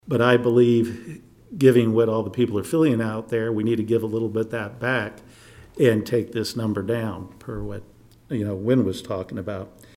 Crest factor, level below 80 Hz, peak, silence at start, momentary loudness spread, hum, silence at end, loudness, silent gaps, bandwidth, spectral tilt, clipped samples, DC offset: 20 dB; -54 dBFS; -2 dBFS; 0.05 s; 17 LU; none; 0.3 s; -22 LUFS; none; 16 kHz; -7 dB/octave; under 0.1%; under 0.1%